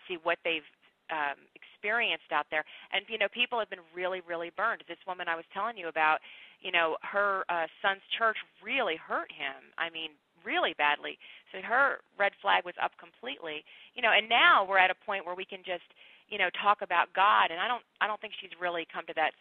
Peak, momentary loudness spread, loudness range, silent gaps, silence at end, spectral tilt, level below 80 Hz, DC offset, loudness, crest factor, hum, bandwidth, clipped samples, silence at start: -8 dBFS; 14 LU; 6 LU; none; 0.1 s; -5.5 dB/octave; -78 dBFS; under 0.1%; -30 LUFS; 22 dB; none; 4.5 kHz; under 0.1%; 0.05 s